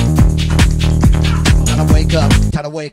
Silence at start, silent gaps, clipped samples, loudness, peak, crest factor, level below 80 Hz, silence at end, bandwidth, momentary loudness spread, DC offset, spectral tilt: 0 s; none; under 0.1%; -13 LUFS; 0 dBFS; 12 dB; -16 dBFS; 0.05 s; 16 kHz; 2 LU; under 0.1%; -5.5 dB/octave